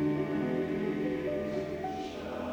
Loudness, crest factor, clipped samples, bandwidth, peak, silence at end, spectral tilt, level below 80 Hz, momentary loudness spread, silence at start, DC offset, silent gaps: -34 LUFS; 14 dB; under 0.1%; 16 kHz; -20 dBFS; 0 s; -7.5 dB/octave; -58 dBFS; 6 LU; 0 s; under 0.1%; none